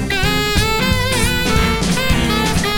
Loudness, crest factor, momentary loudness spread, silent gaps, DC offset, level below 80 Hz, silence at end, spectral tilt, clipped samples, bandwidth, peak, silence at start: -16 LUFS; 14 dB; 1 LU; none; under 0.1%; -24 dBFS; 0 s; -4 dB/octave; under 0.1%; over 20 kHz; 0 dBFS; 0 s